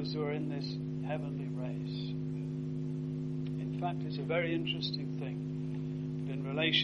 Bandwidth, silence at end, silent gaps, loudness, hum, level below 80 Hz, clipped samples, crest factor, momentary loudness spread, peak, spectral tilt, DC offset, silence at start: 6.6 kHz; 0 s; none; -36 LUFS; 50 Hz at -70 dBFS; -64 dBFS; under 0.1%; 20 dB; 6 LU; -14 dBFS; -7 dB/octave; under 0.1%; 0 s